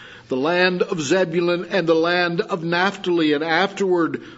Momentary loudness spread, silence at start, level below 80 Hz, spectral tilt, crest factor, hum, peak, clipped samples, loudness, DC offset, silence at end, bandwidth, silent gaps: 4 LU; 0 s; -64 dBFS; -5 dB/octave; 18 dB; none; -2 dBFS; under 0.1%; -20 LUFS; under 0.1%; 0 s; 8 kHz; none